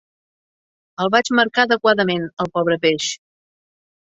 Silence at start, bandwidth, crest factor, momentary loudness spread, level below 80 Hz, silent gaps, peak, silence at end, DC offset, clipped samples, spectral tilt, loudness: 1 s; 8 kHz; 20 dB; 9 LU; -62 dBFS; 2.33-2.37 s; -2 dBFS; 0.95 s; under 0.1%; under 0.1%; -4 dB/octave; -18 LUFS